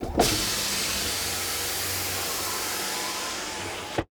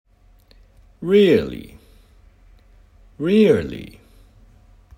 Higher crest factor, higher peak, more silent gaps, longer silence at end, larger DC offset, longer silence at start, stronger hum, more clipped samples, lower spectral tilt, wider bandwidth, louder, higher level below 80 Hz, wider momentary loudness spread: about the same, 22 dB vs 20 dB; second, -6 dBFS vs -2 dBFS; neither; second, 0.15 s vs 1.1 s; neither; second, 0 s vs 1 s; neither; neither; second, -1.5 dB/octave vs -7.5 dB/octave; first, over 20 kHz vs 15.5 kHz; second, -26 LUFS vs -18 LUFS; about the same, -44 dBFS vs -48 dBFS; second, 7 LU vs 22 LU